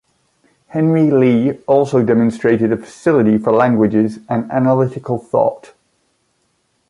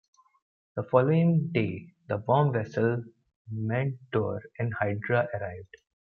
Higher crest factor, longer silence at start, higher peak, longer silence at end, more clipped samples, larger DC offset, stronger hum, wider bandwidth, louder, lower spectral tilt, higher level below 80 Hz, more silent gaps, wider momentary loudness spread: second, 14 dB vs 22 dB; about the same, 0.75 s vs 0.75 s; first, -2 dBFS vs -6 dBFS; first, 1.3 s vs 0.5 s; neither; neither; neither; first, 11 kHz vs 6.4 kHz; first, -15 LUFS vs -28 LUFS; about the same, -8.5 dB/octave vs -9.5 dB/octave; first, -54 dBFS vs -68 dBFS; second, none vs 3.36-3.45 s; second, 6 LU vs 14 LU